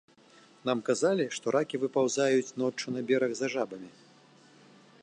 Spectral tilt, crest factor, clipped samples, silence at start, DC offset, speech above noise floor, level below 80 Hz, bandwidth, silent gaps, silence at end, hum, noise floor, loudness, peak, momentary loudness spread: -4.5 dB/octave; 18 dB; under 0.1%; 0.65 s; under 0.1%; 29 dB; -82 dBFS; 10.5 kHz; none; 1.15 s; none; -58 dBFS; -30 LUFS; -14 dBFS; 9 LU